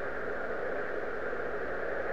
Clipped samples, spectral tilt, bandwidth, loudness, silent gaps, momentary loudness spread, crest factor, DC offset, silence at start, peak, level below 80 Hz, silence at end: under 0.1%; -6.5 dB/octave; 10.5 kHz; -36 LUFS; none; 1 LU; 12 dB; 1%; 0 s; -22 dBFS; -56 dBFS; 0 s